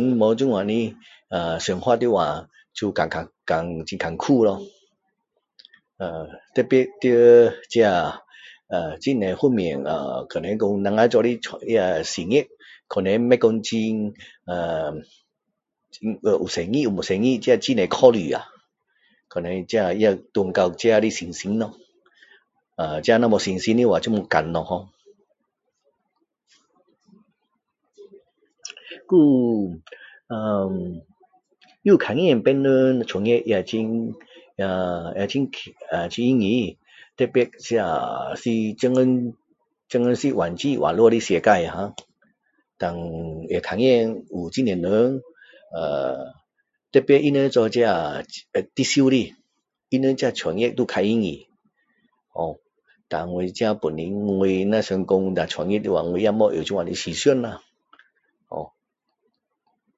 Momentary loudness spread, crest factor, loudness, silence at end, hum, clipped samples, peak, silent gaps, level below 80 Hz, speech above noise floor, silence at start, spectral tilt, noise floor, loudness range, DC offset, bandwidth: 14 LU; 22 dB; -21 LUFS; 1.3 s; none; under 0.1%; 0 dBFS; none; -54 dBFS; 59 dB; 0 s; -5.5 dB/octave; -79 dBFS; 5 LU; under 0.1%; 8 kHz